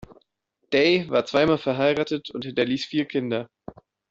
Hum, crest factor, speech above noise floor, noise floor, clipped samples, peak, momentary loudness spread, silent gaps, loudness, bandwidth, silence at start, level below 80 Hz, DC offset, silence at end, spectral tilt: none; 18 dB; 51 dB; -74 dBFS; under 0.1%; -6 dBFS; 10 LU; none; -23 LUFS; 7.8 kHz; 0 s; -60 dBFS; under 0.1%; 0.4 s; -6 dB/octave